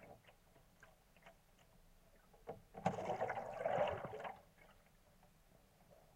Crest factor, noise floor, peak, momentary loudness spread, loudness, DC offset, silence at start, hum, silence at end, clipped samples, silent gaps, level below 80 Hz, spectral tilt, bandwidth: 24 dB; -69 dBFS; -24 dBFS; 26 LU; -44 LUFS; under 0.1%; 0 s; none; 0.15 s; under 0.1%; none; -70 dBFS; -6 dB/octave; 16 kHz